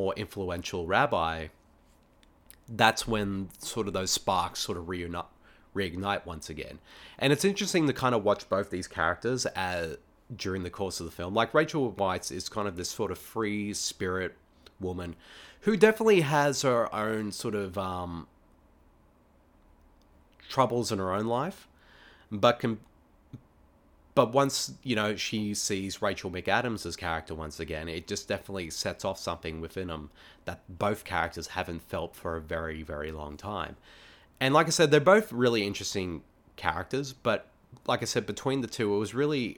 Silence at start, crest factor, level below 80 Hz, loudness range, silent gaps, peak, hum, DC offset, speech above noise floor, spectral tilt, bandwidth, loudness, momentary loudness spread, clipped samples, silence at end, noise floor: 0 s; 26 dB; -54 dBFS; 8 LU; none; -4 dBFS; none; under 0.1%; 33 dB; -4 dB/octave; 19 kHz; -29 LUFS; 14 LU; under 0.1%; 0.05 s; -62 dBFS